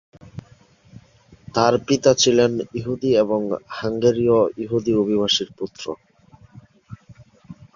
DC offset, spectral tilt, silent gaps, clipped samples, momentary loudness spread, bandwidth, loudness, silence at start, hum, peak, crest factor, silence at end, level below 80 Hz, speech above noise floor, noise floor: under 0.1%; -4.5 dB/octave; none; under 0.1%; 17 LU; 7.4 kHz; -20 LUFS; 0.25 s; none; -2 dBFS; 20 dB; 0.2 s; -54 dBFS; 33 dB; -52 dBFS